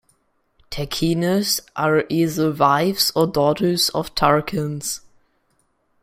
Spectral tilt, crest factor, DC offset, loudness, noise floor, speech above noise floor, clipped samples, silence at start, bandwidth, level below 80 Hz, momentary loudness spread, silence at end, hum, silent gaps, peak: -4.5 dB/octave; 20 dB; under 0.1%; -19 LUFS; -66 dBFS; 46 dB; under 0.1%; 0.7 s; 16 kHz; -48 dBFS; 10 LU; 1.05 s; none; none; -2 dBFS